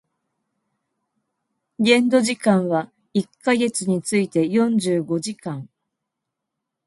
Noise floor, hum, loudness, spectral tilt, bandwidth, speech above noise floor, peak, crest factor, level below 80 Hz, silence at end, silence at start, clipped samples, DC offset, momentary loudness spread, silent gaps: -82 dBFS; none; -20 LUFS; -5 dB/octave; 11.5 kHz; 62 dB; -2 dBFS; 20 dB; -68 dBFS; 1.2 s; 1.8 s; under 0.1%; under 0.1%; 9 LU; none